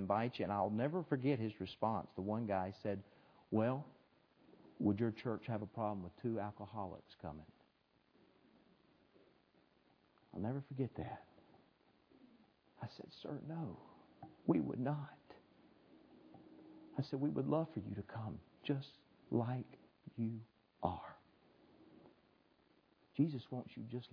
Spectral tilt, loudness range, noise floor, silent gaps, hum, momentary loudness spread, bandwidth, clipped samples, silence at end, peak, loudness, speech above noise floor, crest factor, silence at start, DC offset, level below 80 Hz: -7 dB/octave; 10 LU; -76 dBFS; none; none; 18 LU; 5.4 kHz; under 0.1%; 0.05 s; -20 dBFS; -42 LUFS; 35 dB; 22 dB; 0 s; under 0.1%; -74 dBFS